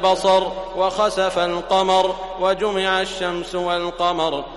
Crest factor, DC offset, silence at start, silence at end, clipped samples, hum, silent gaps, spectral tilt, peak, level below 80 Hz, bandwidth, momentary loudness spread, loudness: 16 dB; under 0.1%; 0 s; 0 s; under 0.1%; none; none; -3.5 dB/octave; -4 dBFS; -44 dBFS; 11.5 kHz; 7 LU; -20 LUFS